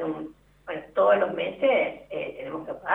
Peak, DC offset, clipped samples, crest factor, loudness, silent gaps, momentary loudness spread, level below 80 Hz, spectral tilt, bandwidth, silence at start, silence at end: -8 dBFS; under 0.1%; under 0.1%; 18 dB; -26 LUFS; none; 15 LU; -62 dBFS; -7 dB/octave; 3.9 kHz; 0 s; 0 s